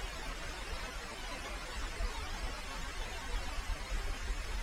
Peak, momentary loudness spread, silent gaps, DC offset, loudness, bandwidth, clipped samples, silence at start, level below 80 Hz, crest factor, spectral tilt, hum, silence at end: -24 dBFS; 2 LU; none; under 0.1%; -42 LUFS; 16 kHz; under 0.1%; 0 s; -40 dBFS; 14 dB; -3 dB/octave; none; 0 s